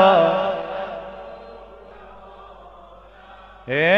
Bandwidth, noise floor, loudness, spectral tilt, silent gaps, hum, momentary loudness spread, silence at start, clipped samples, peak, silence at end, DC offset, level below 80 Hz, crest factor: 6.6 kHz; -45 dBFS; -21 LUFS; -6.5 dB/octave; none; none; 26 LU; 0 s; under 0.1%; -2 dBFS; 0 s; under 0.1%; -52 dBFS; 20 dB